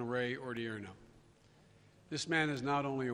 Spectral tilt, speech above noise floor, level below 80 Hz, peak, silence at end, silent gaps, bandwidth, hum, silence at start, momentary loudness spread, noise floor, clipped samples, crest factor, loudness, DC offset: -5 dB/octave; 28 dB; -70 dBFS; -18 dBFS; 0 s; none; 11.5 kHz; none; 0 s; 11 LU; -64 dBFS; under 0.1%; 20 dB; -37 LUFS; under 0.1%